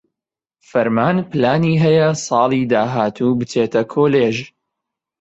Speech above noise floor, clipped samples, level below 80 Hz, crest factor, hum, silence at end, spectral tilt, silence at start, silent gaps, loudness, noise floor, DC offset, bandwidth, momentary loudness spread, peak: 71 dB; under 0.1%; -54 dBFS; 14 dB; none; 0.75 s; -6.5 dB/octave; 0.75 s; none; -16 LUFS; -87 dBFS; under 0.1%; 8.2 kHz; 5 LU; -2 dBFS